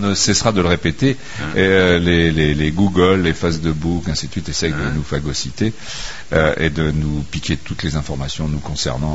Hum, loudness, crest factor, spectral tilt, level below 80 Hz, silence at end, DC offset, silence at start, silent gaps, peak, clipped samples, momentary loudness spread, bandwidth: none; -18 LUFS; 16 dB; -5 dB/octave; -32 dBFS; 0 s; 3%; 0 s; none; 0 dBFS; under 0.1%; 9 LU; 8 kHz